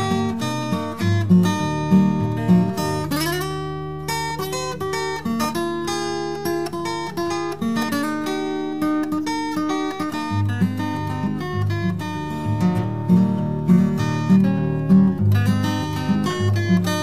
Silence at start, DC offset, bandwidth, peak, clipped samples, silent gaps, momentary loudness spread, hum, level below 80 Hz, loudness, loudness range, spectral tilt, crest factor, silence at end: 0 s; 0.7%; 16 kHz; -4 dBFS; under 0.1%; none; 8 LU; none; -46 dBFS; -21 LUFS; 6 LU; -6.5 dB/octave; 16 dB; 0 s